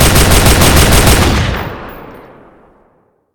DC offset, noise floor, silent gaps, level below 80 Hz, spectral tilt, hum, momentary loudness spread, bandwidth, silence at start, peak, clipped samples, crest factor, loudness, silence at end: under 0.1%; -53 dBFS; none; -16 dBFS; -4 dB/octave; none; 18 LU; over 20 kHz; 0 s; 0 dBFS; 1%; 10 dB; -8 LUFS; 1.15 s